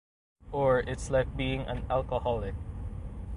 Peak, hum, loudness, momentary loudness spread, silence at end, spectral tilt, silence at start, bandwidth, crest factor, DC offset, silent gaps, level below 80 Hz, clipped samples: -12 dBFS; none; -31 LUFS; 13 LU; 0 s; -6 dB/octave; 0.45 s; 11.5 kHz; 18 dB; under 0.1%; none; -40 dBFS; under 0.1%